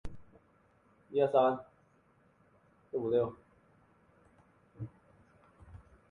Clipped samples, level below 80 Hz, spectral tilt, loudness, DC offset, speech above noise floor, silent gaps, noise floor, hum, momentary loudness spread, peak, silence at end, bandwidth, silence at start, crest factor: under 0.1%; -62 dBFS; -8.5 dB/octave; -32 LUFS; under 0.1%; 38 dB; none; -68 dBFS; none; 29 LU; -14 dBFS; 0.35 s; 9.8 kHz; 0.05 s; 24 dB